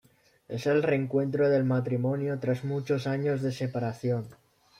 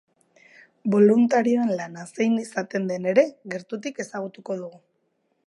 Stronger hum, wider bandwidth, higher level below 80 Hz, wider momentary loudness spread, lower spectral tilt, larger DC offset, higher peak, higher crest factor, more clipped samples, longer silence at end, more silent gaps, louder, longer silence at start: neither; about the same, 12.5 kHz vs 11.5 kHz; first, -68 dBFS vs -78 dBFS; second, 7 LU vs 15 LU; first, -8 dB/octave vs -6.5 dB/octave; neither; second, -14 dBFS vs -4 dBFS; second, 14 dB vs 20 dB; neither; second, 0.45 s vs 0.75 s; neither; second, -28 LUFS vs -23 LUFS; second, 0.5 s vs 0.85 s